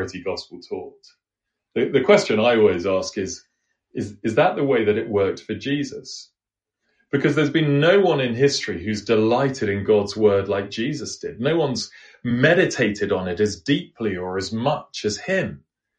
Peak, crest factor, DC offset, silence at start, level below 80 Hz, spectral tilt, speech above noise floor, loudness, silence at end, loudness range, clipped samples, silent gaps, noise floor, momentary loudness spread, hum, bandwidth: -2 dBFS; 20 dB; under 0.1%; 0 s; -56 dBFS; -5.5 dB/octave; 66 dB; -21 LUFS; 0.4 s; 4 LU; under 0.1%; none; -86 dBFS; 15 LU; none; 9.4 kHz